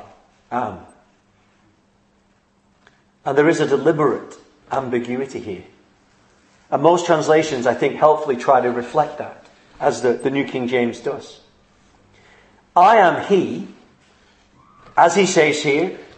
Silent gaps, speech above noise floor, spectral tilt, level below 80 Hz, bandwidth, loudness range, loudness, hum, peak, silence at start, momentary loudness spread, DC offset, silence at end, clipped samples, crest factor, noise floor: none; 42 dB; -5 dB/octave; -62 dBFS; 8.8 kHz; 6 LU; -18 LUFS; none; 0 dBFS; 0.5 s; 15 LU; under 0.1%; 0.15 s; under 0.1%; 20 dB; -59 dBFS